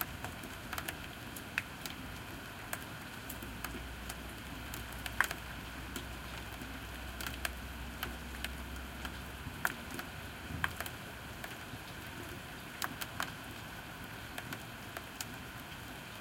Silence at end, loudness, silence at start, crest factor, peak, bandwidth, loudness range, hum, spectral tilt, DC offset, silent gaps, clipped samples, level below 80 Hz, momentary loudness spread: 0 s; -42 LUFS; 0 s; 32 dB; -10 dBFS; 17 kHz; 3 LU; none; -3 dB/octave; under 0.1%; none; under 0.1%; -52 dBFS; 7 LU